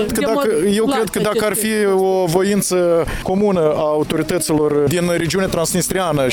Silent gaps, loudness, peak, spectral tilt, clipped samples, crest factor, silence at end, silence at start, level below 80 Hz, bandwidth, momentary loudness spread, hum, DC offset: none; -16 LUFS; -2 dBFS; -4.5 dB/octave; under 0.1%; 14 dB; 0 s; 0 s; -38 dBFS; 19.5 kHz; 2 LU; none; under 0.1%